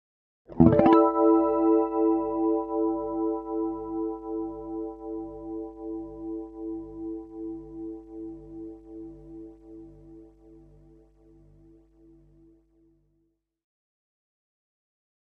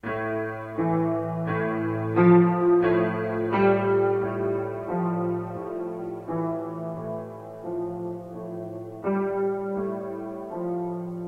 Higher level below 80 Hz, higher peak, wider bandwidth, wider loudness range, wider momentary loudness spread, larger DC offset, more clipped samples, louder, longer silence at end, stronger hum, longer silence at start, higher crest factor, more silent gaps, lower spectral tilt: first, -52 dBFS vs -60 dBFS; first, -2 dBFS vs -6 dBFS; about the same, 4.2 kHz vs 4.6 kHz; first, 24 LU vs 10 LU; first, 23 LU vs 14 LU; neither; neither; about the same, -26 LUFS vs -26 LUFS; first, 4.65 s vs 0 s; first, 50 Hz at -55 dBFS vs none; first, 0.5 s vs 0.05 s; first, 26 dB vs 18 dB; neither; about the same, -11 dB/octave vs -10 dB/octave